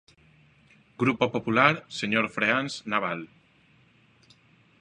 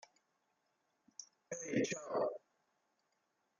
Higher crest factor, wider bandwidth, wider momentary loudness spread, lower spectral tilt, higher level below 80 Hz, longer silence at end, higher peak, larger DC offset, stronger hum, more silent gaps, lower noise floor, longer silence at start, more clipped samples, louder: about the same, 26 dB vs 22 dB; about the same, 10.5 kHz vs 10 kHz; second, 10 LU vs 17 LU; about the same, -5 dB/octave vs -4 dB/octave; first, -68 dBFS vs -86 dBFS; first, 1.55 s vs 1.25 s; first, -2 dBFS vs -22 dBFS; neither; neither; neither; second, -61 dBFS vs -83 dBFS; second, 1 s vs 1.2 s; neither; first, -25 LUFS vs -40 LUFS